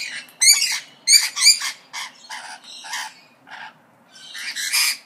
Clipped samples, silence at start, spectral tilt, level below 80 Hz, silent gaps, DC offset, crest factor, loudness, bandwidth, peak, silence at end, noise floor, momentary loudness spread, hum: under 0.1%; 0 s; 5 dB/octave; -86 dBFS; none; under 0.1%; 22 dB; -15 LUFS; 15.5 kHz; 0 dBFS; 0.05 s; -50 dBFS; 23 LU; none